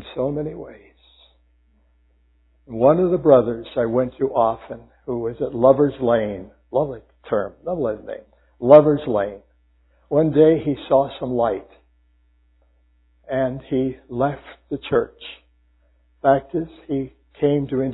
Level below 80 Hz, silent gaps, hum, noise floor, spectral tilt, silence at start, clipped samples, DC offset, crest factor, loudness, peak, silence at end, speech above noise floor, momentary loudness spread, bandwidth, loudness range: -50 dBFS; none; none; -59 dBFS; -11.5 dB/octave; 0 s; under 0.1%; under 0.1%; 22 dB; -20 LUFS; 0 dBFS; 0 s; 40 dB; 17 LU; 4.1 kHz; 8 LU